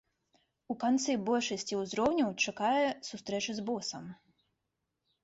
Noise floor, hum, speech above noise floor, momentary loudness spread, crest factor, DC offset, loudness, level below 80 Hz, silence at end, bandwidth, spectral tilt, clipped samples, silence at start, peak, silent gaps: -85 dBFS; none; 52 dB; 11 LU; 16 dB; under 0.1%; -32 LUFS; -72 dBFS; 1.1 s; 8 kHz; -3.5 dB/octave; under 0.1%; 0.7 s; -18 dBFS; none